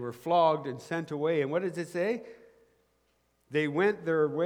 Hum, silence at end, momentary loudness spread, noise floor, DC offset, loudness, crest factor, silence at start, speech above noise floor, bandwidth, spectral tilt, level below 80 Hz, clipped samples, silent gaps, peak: none; 0 s; 9 LU; -72 dBFS; under 0.1%; -30 LUFS; 18 dB; 0 s; 43 dB; 16 kHz; -6.5 dB/octave; -76 dBFS; under 0.1%; none; -12 dBFS